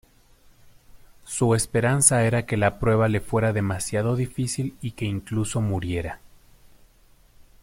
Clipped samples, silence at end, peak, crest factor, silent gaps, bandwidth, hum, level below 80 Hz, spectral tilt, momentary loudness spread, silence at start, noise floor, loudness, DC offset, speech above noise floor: under 0.1%; 0.2 s; 0 dBFS; 24 dB; none; 16.5 kHz; none; -46 dBFS; -5 dB/octave; 13 LU; 0.95 s; -56 dBFS; -23 LUFS; under 0.1%; 33 dB